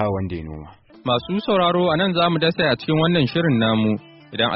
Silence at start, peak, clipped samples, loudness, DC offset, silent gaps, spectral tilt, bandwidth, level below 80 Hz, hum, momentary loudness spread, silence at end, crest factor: 0 s; -6 dBFS; under 0.1%; -19 LUFS; under 0.1%; none; -4 dB/octave; 5.8 kHz; -48 dBFS; none; 13 LU; 0 s; 14 dB